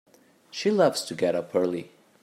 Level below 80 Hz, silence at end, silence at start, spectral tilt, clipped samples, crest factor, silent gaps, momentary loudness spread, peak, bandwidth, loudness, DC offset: -76 dBFS; 0.35 s; 0.55 s; -4.5 dB/octave; under 0.1%; 18 dB; none; 10 LU; -8 dBFS; 16 kHz; -26 LUFS; under 0.1%